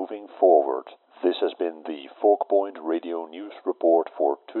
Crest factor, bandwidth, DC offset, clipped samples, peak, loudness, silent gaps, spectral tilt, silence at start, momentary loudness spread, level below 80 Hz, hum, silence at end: 18 dB; 4.2 kHz; under 0.1%; under 0.1%; -6 dBFS; -24 LUFS; none; -1.5 dB/octave; 0 s; 14 LU; under -90 dBFS; none; 0 s